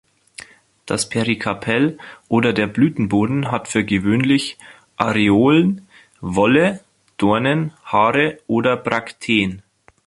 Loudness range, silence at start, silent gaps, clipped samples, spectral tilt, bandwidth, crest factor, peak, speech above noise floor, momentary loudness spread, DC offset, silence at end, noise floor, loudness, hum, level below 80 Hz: 2 LU; 0.4 s; none; under 0.1%; -5.5 dB/octave; 11.5 kHz; 18 dB; 0 dBFS; 25 dB; 14 LU; under 0.1%; 0.45 s; -42 dBFS; -18 LUFS; none; -50 dBFS